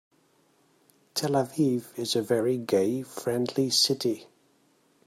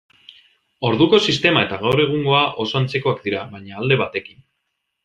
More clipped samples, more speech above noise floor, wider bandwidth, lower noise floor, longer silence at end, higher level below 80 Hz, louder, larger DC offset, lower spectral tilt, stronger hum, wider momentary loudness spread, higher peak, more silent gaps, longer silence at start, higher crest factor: neither; second, 39 dB vs 56 dB; first, 16 kHz vs 10.5 kHz; second, -65 dBFS vs -75 dBFS; about the same, 0.85 s vs 0.85 s; second, -72 dBFS vs -56 dBFS; second, -27 LUFS vs -18 LUFS; neither; about the same, -4.5 dB/octave vs -5.5 dB/octave; neither; about the same, 9 LU vs 11 LU; second, -10 dBFS vs -2 dBFS; neither; first, 1.15 s vs 0.8 s; about the same, 18 dB vs 18 dB